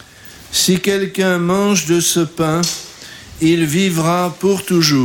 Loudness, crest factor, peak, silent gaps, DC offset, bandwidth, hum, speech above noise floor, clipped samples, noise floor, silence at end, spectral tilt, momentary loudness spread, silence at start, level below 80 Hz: -15 LUFS; 14 dB; -2 dBFS; none; under 0.1%; 17.5 kHz; none; 24 dB; under 0.1%; -39 dBFS; 0 s; -4 dB/octave; 6 LU; 0.25 s; -48 dBFS